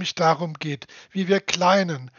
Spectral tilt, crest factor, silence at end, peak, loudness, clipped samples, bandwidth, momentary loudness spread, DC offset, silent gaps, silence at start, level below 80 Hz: -3.5 dB/octave; 20 dB; 0.1 s; -2 dBFS; -22 LUFS; under 0.1%; 7.4 kHz; 13 LU; under 0.1%; none; 0 s; -68 dBFS